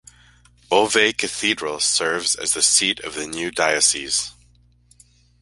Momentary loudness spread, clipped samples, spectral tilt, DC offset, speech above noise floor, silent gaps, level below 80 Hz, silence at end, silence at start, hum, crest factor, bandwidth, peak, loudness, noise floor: 11 LU; under 0.1%; -0.5 dB/octave; under 0.1%; 35 dB; none; -56 dBFS; 1.1 s; 0.7 s; 60 Hz at -55 dBFS; 22 dB; 12 kHz; 0 dBFS; -19 LUFS; -55 dBFS